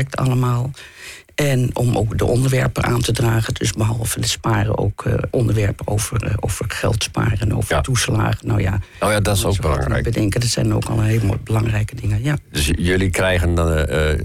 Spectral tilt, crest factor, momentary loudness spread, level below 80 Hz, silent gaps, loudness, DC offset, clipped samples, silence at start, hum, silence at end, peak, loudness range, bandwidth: -5 dB/octave; 10 dB; 4 LU; -32 dBFS; none; -19 LUFS; under 0.1%; under 0.1%; 0 s; none; 0 s; -8 dBFS; 1 LU; 16 kHz